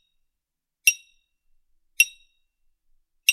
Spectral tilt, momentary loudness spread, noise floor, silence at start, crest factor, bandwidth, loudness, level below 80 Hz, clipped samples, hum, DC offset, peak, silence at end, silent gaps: 9.5 dB/octave; 4 LU; -83 dBFS; 0.85 s; 28 dB; 16 kHz; -21 LUFS; -72 dBFS; under 0.1%; none; under 0.1%; 0 dBFS; 0 s; none